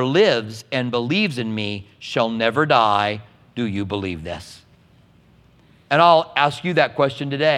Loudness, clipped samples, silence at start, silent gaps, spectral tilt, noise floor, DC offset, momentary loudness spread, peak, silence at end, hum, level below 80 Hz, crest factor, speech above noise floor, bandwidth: -19 LUFS; under 0.1%; 0 s; none; -5.5 dB/octave; -53 dBFS; under 0.1%; 13 LU; 0 dBFS; 0 s; none; -56 dBFS; 20 dB; 34 dB; 12.5 kHz